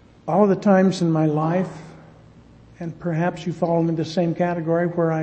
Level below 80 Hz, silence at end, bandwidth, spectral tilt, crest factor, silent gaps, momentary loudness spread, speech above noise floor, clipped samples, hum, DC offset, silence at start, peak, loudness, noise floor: -56 dBFS; 0 s; 8.6 kHz; -8 dB/octave; 18 dB; none; 12 LU; 28 dB; under 0.1%; none; under 0.1%; 0.25 s; -4 dBFS; -21 LUFS; -48 dBFS